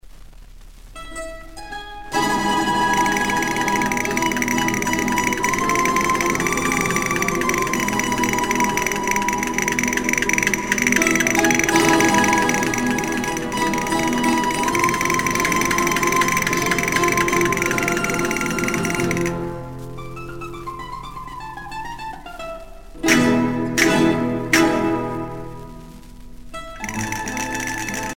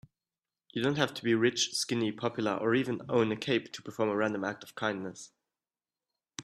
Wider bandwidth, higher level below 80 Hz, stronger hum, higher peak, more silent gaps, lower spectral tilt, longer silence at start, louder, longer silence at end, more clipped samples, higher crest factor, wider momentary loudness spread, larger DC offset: first, over 20 kHz vs 13.5 kHz; first, -40 dBFS vs -72 dBFS; neither; first, -2 dBFS vs -10 dBFS; neither; about the same, -3.5 dB/octave vs -4 dB/octave; second, 0.05 s vs 0.75 s; first, -19 LUFS vs -31 LUFS; about the same, 0 s vs 0 s; neither; about the same, 18 dB vs 22 dB; first, 17 LU vs 12 LU; neither